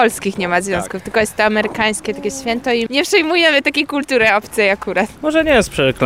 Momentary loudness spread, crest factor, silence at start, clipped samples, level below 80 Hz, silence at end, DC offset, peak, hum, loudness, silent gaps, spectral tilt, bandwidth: 8 LU; 14 dB; 0 s; under 0.1%; -42 dBFS; 0 s; 0.2%; -2 dBFS; none; -15 LUFS; none; -3.5 dB/octave; 16.5 kHz